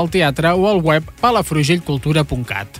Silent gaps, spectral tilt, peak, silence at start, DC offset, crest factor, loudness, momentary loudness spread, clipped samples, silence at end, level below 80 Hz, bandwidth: none; -5.5 dB/octave; -2 dBFS; 0 s; under 0.1%; 14 dB; -16 LUFS; 4 LU; under 0.1%; 0 s; -38 dBFS; 16 kHz